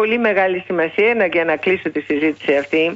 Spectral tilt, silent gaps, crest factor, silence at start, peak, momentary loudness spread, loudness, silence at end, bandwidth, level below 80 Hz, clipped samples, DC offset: -6.5 dB/octave; none; 14 dB; 0 s; -4 dBFS; 4 LU; -17 LUFS; 0 s; 7.8 kHz; -60 dBFS; under 0.1%; under 0.1%